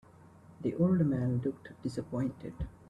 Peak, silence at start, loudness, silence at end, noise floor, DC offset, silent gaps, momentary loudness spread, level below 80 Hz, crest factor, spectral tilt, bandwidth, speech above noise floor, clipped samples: -16 dBFS; 0.5 s; -33 LUFS; 0.2 s; -56 dBFS; under 0.1%; none; 13 LU; -54 dBFS; 18 dB; -9.5 dB/octave; 10.5 kHz; 24 dB; under 0.1%